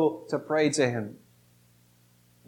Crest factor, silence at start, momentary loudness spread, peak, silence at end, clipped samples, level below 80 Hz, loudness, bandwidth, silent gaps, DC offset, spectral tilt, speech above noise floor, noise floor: 20 dB; 0 s; 11 LU; -10 dBFS; 1.35 s; under 0.1%; -74 dBFS; -27 LUFS; 16.5 kHz; none; under 0.1%; -5 dB/octave; 35 dB; -62 dBFS